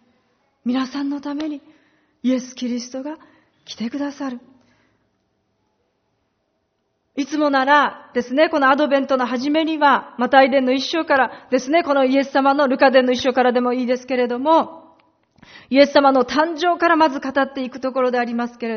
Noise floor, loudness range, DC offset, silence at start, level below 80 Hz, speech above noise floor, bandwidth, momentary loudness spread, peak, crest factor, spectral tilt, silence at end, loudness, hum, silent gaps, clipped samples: -70 dBFS; 15 LU; under 0.1%; 0.65 s; -64 dBFS; 52 dB; 6.6 kHz; 14 LU; 0 dBFS; 20 dB; -1 dB/octave; 0 s; -18 LUFS; none; none; under 0.1%